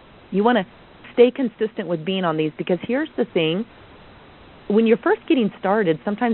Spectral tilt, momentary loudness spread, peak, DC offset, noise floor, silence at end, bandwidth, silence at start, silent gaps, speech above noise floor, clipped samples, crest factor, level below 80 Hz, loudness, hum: -4.5 dB/octave; 9 LU; -2 dBFS; under 0.1%; -46 dBFS; 0 s; 4.3 kHz; 0.3 s; none; 26 dB; under 0.1%; 20 dB; -60 dBFS; -21 LUFS; none